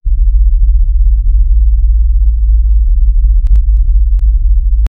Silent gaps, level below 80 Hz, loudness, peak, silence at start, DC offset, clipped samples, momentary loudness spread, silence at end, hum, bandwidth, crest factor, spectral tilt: none; -8 dBFS; -12 LUFS; 0 dBFS; 0.05 s; 1%; under 0.1%; 1 LU; 0.1 s; none; 0.3 kHz; 6 dB; -10 dB/octave